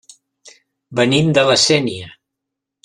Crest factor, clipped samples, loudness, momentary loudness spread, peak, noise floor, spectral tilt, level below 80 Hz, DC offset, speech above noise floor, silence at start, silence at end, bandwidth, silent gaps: 16 dB; under 0.1%; -14 LUFS; 13 LU; -2 dBFS; -81 dBFS; -4 dB/octave; -54 dBFS; under 0.1%; 66 dB; 0.45 s; 0.75 s; 11.5 kHz; none